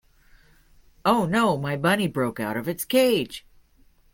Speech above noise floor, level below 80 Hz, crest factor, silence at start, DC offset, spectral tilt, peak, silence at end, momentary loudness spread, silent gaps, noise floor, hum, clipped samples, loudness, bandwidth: 35 dB; -56 dBFS; 20 dB; 1.05 s; under 0.1%; -5 dB/octave; -6 dBFS; 0.75 s; 8 LU; none; -58 dBFS; none; under 0.1%; -23 LUFS; 17 kHz